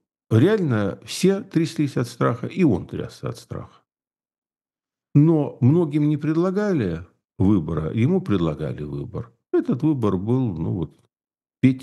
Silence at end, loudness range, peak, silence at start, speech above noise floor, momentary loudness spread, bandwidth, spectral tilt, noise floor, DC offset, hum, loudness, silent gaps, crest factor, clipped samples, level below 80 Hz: 0 s; 5 LU; -4 dBFS; 0.3 s; over 69 dB; 14 LU; 12.5 kHz; -8 dB/octave; under -90 dBFS; under 0.1%; none; -22 LUFS; 4.38-4.42 s; 18 dB; under 0.1%; -50 dBFS